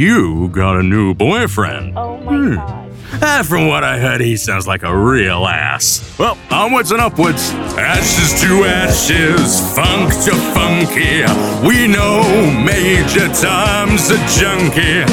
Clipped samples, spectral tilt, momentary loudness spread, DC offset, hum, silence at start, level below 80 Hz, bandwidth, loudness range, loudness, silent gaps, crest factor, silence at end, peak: under 0.1%; -4 dB/octave; 6 LU; under 0.1%; none; 0 s; -28 dBFS; 19 kHz; 4 LU; -12 LUFS; none; 12 dB; 0 s; -2 dBFS